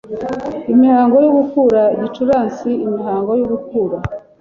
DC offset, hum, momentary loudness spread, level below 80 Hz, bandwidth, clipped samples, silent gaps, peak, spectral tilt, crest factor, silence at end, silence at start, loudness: under 0.1%; none; 12 LU; -46 dBFS; 6.8 kHz; under 0.1%; none; -2 dBFS; -8.5 dB/octave; 12 dB; 0.2 s; 0.05 s; -15 LUFS